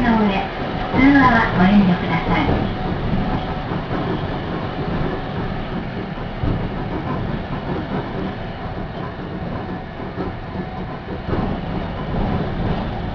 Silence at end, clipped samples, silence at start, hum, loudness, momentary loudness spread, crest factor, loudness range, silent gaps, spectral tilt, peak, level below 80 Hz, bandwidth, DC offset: 0 s; under 0.1%; 0 s; none; -21 LUFS; 14 LU; 18 dB; 10 LU; none; -8.5 dB/octave; -2 dBFS; -30 dBFS; 5.4 kHz; under 0.1%